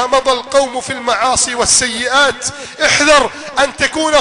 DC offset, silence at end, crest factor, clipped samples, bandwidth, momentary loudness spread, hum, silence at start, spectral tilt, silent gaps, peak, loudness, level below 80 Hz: under 0.1%; 0 s; 12 dB; under 0.1%; 13 kHz; 8 LU; none; 0 s; -1 dB/octave; none; 0 dBFS; -12 LUFS; -40 dBFS